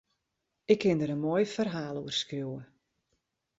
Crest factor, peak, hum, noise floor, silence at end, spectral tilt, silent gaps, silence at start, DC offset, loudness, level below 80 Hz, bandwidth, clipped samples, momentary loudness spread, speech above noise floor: 24 dB; -8 dBFS; none; -83 dBFS; 0.95 s; -5.5 dB/octave; none; 0.7 s; under 0.1%; -30 LUFS; -70 dBFS; 8 kHz; under 0.1%; 13 LU; 54 dB